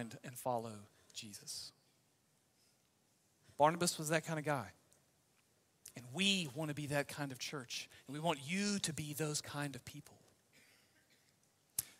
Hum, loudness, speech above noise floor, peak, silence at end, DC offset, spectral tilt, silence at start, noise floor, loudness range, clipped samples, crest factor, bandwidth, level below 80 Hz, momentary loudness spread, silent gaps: none; -39 LUFS; 36 dB; -16 dBFS; 0.05 s; under 0.1%; -3.5 dB/octave; 0 s; -76 dBFS; 6 LU; under 0.1%; 26 dB; 16 kHz; -78 dBFS; 19 LU; none